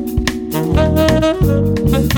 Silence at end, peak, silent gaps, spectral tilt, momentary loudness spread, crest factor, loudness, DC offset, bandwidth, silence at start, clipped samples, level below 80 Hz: 0 s; -2 dBFS; none; -6.5 dB/octave; 6 LU; 10 dB; -15 LUFS; under 0.1%; over 20 kHz; 0 s; under 0.1%; -24 dBFS